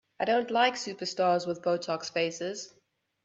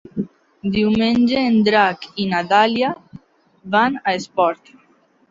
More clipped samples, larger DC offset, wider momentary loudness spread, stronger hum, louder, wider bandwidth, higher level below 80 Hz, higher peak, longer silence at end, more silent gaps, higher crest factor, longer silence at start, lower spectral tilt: neither; neither; second, 10 LU vs 14 LU; neither; second, -29 LUFS vs -18 LUFS; about the same, 8.2 kHz vs 7.6 kHz; second, -76 dBFS vs -52 dBFS; second, -10 dBFS vs -2 dBFS; second, 0.55 s vs 0.75 s; neither; about the same, 20 dB vs 16 dB; about the same, 0.2 s vs 0.15 s; second, -3.5 dB/octave vs -6 dB/octave